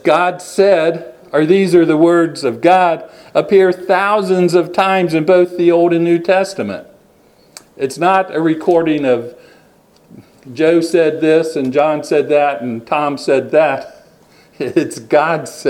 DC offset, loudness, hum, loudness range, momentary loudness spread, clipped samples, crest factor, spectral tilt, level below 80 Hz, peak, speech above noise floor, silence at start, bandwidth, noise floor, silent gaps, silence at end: under 0.1%; -14 LUFS; none; 4 LU; 8 LU; under 0.1%; 14 dB; -6 dB/octave; -60 dBFS; 0 dBFS; 36 dB; 0.05 s; 13 kHz; -49 dBFS; none; 0 s